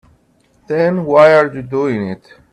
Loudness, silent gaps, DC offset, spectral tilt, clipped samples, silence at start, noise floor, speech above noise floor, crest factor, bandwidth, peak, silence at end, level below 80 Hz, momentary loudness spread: -13 LUFS; none; under 0.1%; -7.5 dB/octave; under 0.1%; 0.7 s; -55 dBFS; 42 dB; 14 dB; 8.8 kHz; 0 dBFS; 0.35 s; -54 dBFS; 14 LU